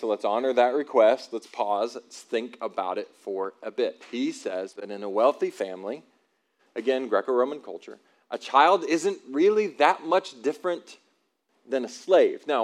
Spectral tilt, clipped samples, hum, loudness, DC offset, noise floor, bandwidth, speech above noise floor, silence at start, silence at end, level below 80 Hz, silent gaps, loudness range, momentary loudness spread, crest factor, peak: -4 dB/octave; under 0.1%; none; -25 LUFS; under 0.1%; -71 dBFS; 12 kHz; 46 dB; 0 s; 0 s; under -90 dBFS; none; 6 LU; 15 LU; 22 dB; -4 dBFS